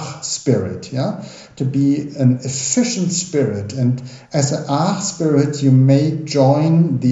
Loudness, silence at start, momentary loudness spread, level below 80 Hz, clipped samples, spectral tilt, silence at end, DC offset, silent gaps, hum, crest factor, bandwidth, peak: -17 LUFS; 0 s; 10 LU; -58 dBFS; under 0.1%; -6 dB/octave; 0 s; under 0.1%; none; none; 16 dB; 8 kHz; -2 dBFS